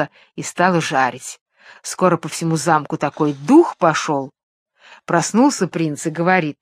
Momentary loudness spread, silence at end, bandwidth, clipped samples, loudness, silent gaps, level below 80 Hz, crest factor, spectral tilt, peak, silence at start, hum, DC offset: 16 LU; 0.1 s; 14.5 kHz; under 0.1%; -18 LUFS; 1.41-1.46 s, 4.43-4.66 s; -66 dBFS; 18 dB; -5 dB/octave; 0 dBFS; 0 s; none; under 0.1%